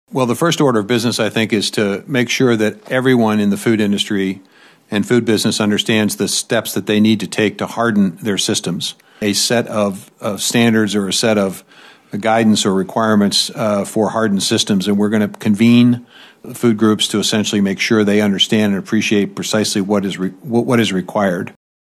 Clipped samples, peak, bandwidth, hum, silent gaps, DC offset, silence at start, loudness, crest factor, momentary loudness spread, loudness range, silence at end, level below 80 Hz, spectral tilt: under 0.1%; -2 dBFS; 14.5 kHz; none; none; under 0.1%; 0.1 s; -15 LUFS; 14 dB; 7 LU; 2 LU; 0.35 s; -64 dBFS; -4.5 dB/octave